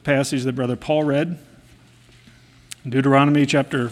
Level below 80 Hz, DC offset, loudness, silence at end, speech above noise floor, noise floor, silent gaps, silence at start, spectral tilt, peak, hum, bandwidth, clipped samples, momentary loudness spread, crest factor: -56 dBFS; under 0.1%; -19 LUFS; 0 s; 31 dB; -50 dBFS; none; 0.05 s; -6 dB/octave; -2 dBFS; none; 13.5 kHz; under 0.1%; 16 LU; 20 dB